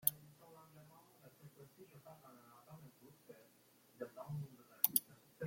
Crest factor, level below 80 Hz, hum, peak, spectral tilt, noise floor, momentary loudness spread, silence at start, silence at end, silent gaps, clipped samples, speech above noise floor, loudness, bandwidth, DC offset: 38 dB; -86 dBFS; none; -10 dBFS; -3.5 dB/octave; -70 dBFS; 27 LU; 0.05 s; 0 s; none; under 0.1%; 19 dB; -40 LUFS; 16.5 kHz; under 0.1%